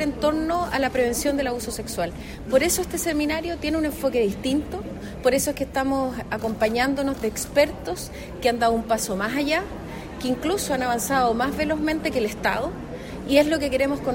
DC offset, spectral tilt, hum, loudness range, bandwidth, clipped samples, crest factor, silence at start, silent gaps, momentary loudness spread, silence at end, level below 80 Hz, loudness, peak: under 0.1%; -4 dB/octave; none; 1 LU; 16.5 kHz; under 0.1%; 18 dB; 0 s; none; 10 LU; 0 s; -42 dBFS; -24 LUFS; -4 dBFS